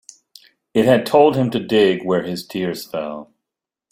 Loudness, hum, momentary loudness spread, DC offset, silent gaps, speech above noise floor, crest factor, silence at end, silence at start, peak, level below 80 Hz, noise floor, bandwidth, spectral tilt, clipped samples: -18 LUFS; none; 13 LU; under 0.1%; none; 67 dB; 16 dB; 0.7 s; 0.75 s; -2 dBFS; -58 dBFS; -84 dBFS; 16 kHz; -6 dB/octave; under 0.1%